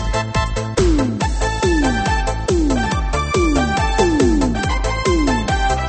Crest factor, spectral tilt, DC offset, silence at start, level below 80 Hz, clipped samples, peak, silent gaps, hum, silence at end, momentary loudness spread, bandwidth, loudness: 16 dB; -5.5 dB/octave; under 0.1%; 0 s; -22 dBFS; under 0.1%; -2 dBFS; none; none; 0 s; 4 LU; 8.8 kHz; -18 LUFS